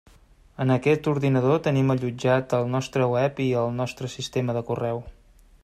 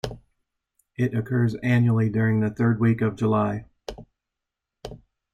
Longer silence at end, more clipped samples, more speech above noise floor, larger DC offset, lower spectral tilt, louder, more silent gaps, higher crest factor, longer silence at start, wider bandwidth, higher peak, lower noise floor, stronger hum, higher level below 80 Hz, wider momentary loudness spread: first, 0.5 s vs 0.35 s; neither; second, 31 dB vs 64 dB; neither; second, -7 dB/octave vs -8.5 dB/octave; about the same, -24 LUFS vs -23 LUFS; neither; about the same, 16 dB vs 16 dB; first, 0.6 s vs 0.05 s; first, 12.5 kHz vs 7.4 kHz; about the same, -8 dBFS vs -8 dBFS; second, -54 dBFS vs -85 dBFS; neither; about the same, -54 dBFS vs -52 dBFS; second, 8 LU vs 21 LU